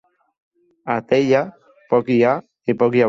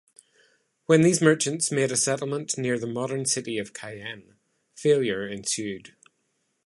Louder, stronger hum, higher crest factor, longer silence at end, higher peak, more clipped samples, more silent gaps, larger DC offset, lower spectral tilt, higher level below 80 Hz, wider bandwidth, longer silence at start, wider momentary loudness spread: first, -19 LUFS vs -24 LUFS; neither; second, 16 dB vs 22 dB; second, 0 s vs 0.8 s; about the same, -4 dBFS vs -4 dBFS; neither; neither; neither; first, -7.5 dB/octave vs -4 dB/octave; first, -60 dBFS vs -68 dBFS; second, 7.4 kHz vs 11.5 kHz; about the same, 0.85 s vs 0.9 s; second, 9 LU vs 17 LU